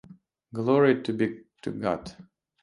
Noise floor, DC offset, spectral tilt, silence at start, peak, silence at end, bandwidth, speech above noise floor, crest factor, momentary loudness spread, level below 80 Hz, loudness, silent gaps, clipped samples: -53 dBFS; under 0.1%; -7.5 dB/octave; 0.1 s; -8 dBFS; 0.4 s; 11 kHz; 28 dB; 20 dB; 17 LU; -62 dBFS; -26 LUFS; none; under 0.1%